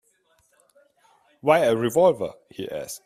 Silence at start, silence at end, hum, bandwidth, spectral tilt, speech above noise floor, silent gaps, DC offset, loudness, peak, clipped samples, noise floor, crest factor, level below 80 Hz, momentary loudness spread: 1.45 s; 0.1 s; none; 16 kHz; -5 dB/octave; 43 dB; none; under 0.1%; -22 LUFS; -4 dBFS; under 0.1%; -65 dBFS; 20 dB; -64 dBFS; 14 LU